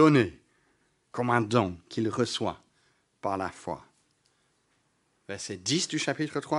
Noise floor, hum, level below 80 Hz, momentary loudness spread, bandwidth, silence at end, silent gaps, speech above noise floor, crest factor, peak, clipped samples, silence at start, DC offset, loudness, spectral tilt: -71 dBFS; none; -66 dBFS; 14 LU; 11.5 kHz; 0 s; none; 44 dB; 22 dB; -8 dBFS; under 0.1%; 0 s; under 0.1%; -29 LUFS; -5 dB/octave